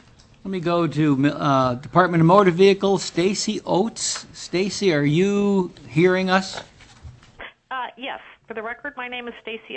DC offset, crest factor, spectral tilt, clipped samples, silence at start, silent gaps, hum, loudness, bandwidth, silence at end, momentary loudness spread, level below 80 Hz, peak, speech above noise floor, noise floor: under 0.1%; 20 dB; -5.5 dB/octave; under 0.1%; 0.45 s; none; none; -20 LUFS; 8.6 kHz; 0 s; 17 LU; -54 dBFS; -2 dBFS; 24 dB; -44 dBFS